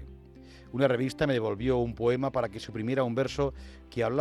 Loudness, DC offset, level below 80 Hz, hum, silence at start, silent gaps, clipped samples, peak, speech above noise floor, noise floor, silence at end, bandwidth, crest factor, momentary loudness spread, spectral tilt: -29 LUFS; under 0.1%; -48 dBFS; none; 0 s; none; under 0.1%; -12 dBFS; 22 dB; -50 dBFS; 0 s; 13.5 kHz; 18 dB; 10 LU; -7 dB/octave